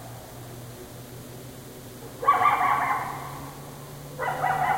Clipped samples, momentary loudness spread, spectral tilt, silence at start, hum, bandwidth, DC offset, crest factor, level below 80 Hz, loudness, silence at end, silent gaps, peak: under 0.1%; 20 LU; -4.5 dB/octave; 0 s; none; 16.5 kHz; under 0.1%; 20 dB; -56 dBFS; -25 LUFS; 0 s; none; -8 dBFS